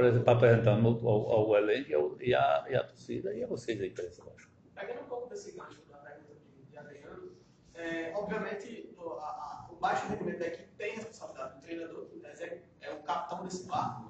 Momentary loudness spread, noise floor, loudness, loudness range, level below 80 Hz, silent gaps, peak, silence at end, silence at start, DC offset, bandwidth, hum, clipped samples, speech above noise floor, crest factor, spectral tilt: 23 LU; -57 dBFS; -32 LUFS; 16 LU; -64 dBFS; none; -10 dBFS; 0 s; 0 s; under 0.1%; 8.2 kHz; none; under 0.1%; 25 dB; 22 dB; -7 dB/octave